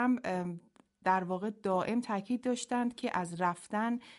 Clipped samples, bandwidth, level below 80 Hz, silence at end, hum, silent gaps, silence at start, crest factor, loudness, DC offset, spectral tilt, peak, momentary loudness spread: under 0.1%; 11.5 kHz; -74 dBFS; 0 s; none; none; 0 s; 18 dB; -34 LUFS; under 0.1%; -5.5 dB/octave; -16 dBFS; 5 LU